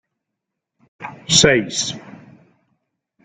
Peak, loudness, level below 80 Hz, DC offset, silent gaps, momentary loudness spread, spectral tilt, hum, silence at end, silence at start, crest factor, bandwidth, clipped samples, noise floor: 0 dBFS; -15 LUFS; -48 dBFS; under 0.1%; none; 23 LU; -2.5 dB/octave; none; 1.15 s; 1 s; 22 dB; 11 kHz; under 0.1%; -81 dBFS